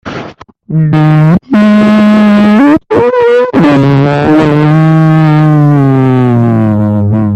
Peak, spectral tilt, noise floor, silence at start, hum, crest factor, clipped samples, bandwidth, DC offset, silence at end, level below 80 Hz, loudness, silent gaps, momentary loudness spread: 0 dBFS; -9 dB/octave; -28 dBFS; 0.05 s; none; 6 dB; under 0.1%; 8 kHz; under 0.1%; 0 s; -40 dBFS; -7 LUFS; none; 4 LU